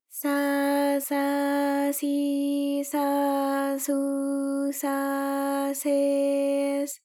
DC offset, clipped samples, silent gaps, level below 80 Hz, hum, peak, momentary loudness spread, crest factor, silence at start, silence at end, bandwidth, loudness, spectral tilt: under 0.1%; under 0.1%; none; under -90 dBFS; none; -14 dBFS; 4 LU; 12 dB; 0.1 s; 0.1 s; 18 kHz; -26 LUFS; -2 dB/octave